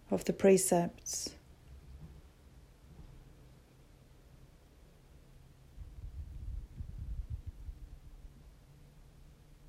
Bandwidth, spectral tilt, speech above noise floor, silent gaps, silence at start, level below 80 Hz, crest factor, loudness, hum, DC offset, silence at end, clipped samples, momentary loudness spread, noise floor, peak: 16 kHz; -5 dB/octave; 30 dB; none; 0.1 s; -52 dBFS; 24 dB; -34 LUFS; none; under 0.1%; 0 s; under 0.1%; 30 LU; -60 dBFS; -14 dBFS